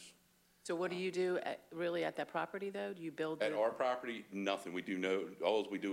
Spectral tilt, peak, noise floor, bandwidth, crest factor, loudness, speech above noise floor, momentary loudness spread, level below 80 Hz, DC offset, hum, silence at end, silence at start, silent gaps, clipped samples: -5 dB/octave; -20 dBFS; -71 dBFS; 16 kHz; 18 dB; -39 LUFS; 33 dB; 8 LU; -86 dBFS; under 0.1%; none; 0 s; 0 s; none; under 0.1%